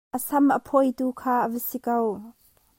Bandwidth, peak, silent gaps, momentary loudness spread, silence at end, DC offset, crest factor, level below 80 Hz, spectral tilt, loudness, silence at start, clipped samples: 16.5 kHz; -8 dBFS; none; 8 LU; 0.5 s; under 0.1%; 18 dB; -66 dBFS; -5.5 dB/octave; -24 LUFS; 0.15 s; under 0.1%